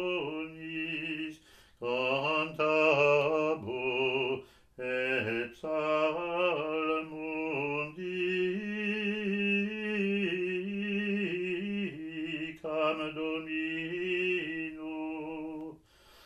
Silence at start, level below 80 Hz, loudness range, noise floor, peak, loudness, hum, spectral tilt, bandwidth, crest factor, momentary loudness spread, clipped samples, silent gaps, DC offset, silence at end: 0 s; -68 dBFS; 5 LU; -59 dBFS; -14 dBFS; -32 LUFS; none; -6 dB/octave; 12 kHz; 18 dB; 10 LU; under 0.1%; none; under 0.1%; 0.5 s